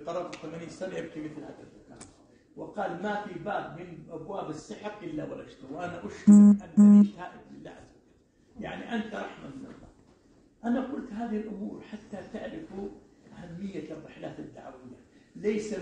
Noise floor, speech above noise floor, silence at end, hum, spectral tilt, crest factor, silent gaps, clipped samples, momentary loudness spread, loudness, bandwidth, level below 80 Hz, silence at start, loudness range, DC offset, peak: -63 dBFS; 35 dB; 0 s; none; -8 dB/octave; 22 dB; none; under 0.1%; 25 LU; -26 LUFS; 8.6 kHz; -64 dBFS; 0 s; 18 LU; under 0.1%; -8 dBFS